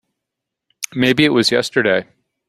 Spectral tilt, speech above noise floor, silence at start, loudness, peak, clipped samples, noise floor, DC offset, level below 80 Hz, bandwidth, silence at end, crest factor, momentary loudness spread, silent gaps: -4 dB/octave; 66 dB; 0.8 s; -15 LUFS; 0 dBFS; under 0.1%; -81 dBFS; under 0.1%; -54 dBFS; 15.5 kHz; 0.45 s; 18 dB; 11 LU; none